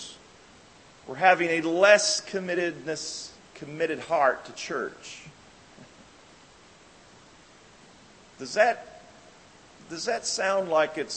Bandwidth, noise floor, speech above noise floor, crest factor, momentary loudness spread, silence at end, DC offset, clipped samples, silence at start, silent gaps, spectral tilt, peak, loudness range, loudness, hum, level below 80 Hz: 8.8 kHz; -54 dBFS; 28 dB; 24 dB; 22 LU; 0 s; under 0.1%; under 0.1%; 0 s; none; -2.5 dB/octave; -4 dBFS; 16 LU; -25 LUFS; none; -68 dBFS